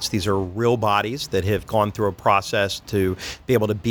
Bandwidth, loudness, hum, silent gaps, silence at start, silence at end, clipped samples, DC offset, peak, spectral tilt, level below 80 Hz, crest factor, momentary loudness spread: 19.5 kHz; -22 LUFS; none; none; 0 s; 0 s; under 0.1%; under 0.1%; -4 dBFS; -5 dB/octave; -46 dBFS; 18 dB; 5 LU